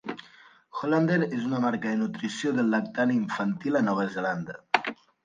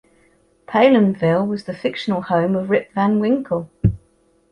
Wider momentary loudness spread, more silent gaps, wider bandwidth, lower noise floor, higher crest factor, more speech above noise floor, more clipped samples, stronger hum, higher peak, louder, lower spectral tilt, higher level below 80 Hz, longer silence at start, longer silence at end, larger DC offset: about the same, 9 LU vs 10 LU; neither; about the same, 9.4 kHz vs 9.6 kHz; about the same, -55 dBFS vs -58 dBFS; first, 24 dB vs 16 dB; second, 28 dB vs 41 dB; neither; neither; about the same, -4 dBFS vs -2 dBFS; second, -27 LUFS vs -19 LUFS; second, -6.5 dB/octave vs -8.5 dB/octave; second, -72 dBFS vs -42 dBFS; second, 0.05 s vs 0.7 s; second, 0.3 s vs 0.55 s; neither